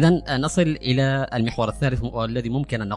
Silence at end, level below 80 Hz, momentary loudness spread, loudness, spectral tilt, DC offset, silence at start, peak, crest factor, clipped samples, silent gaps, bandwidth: 0 s; -40 dBFS; 5 LU; -23 LUFS; -6 dB/octave; under 0.1%; 0 s; -4 dBFS; 18 dB; under 0.1%; none; 11.5 kHz